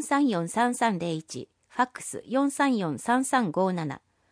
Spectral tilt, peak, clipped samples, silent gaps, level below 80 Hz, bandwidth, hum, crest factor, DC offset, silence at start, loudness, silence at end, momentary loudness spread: -5 dB/octave; -10 dBFS; under 0.1%; none; -72 dBFS; 10.5 kHz; none; 16 dB; under 0.1%; 0 s; -27 LUFS; 0.35 s; 12 LU